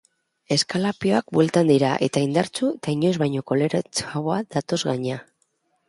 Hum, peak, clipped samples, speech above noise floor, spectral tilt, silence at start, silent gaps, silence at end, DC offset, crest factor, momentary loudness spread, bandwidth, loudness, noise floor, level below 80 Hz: none; -6 dBFS; under 0.1%; 47 dB; -5.5 dB/octave; 0.5 s; none; 0.65 s; under 0.1%; 18 dB; 7 LU; 11.5 kHz; -22 LUFS; -69 dBFS; -62 dBFS